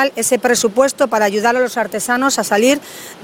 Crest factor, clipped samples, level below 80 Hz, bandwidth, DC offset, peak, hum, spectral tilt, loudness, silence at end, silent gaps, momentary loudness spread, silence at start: 16 dB; under 0.1%; -58 dBFS; 16.5 kHz; under 0.1%; 0 dBFS; none; -2.5 dB/octave; -15 LUFS; 0 s; none; 5 LU; 0 s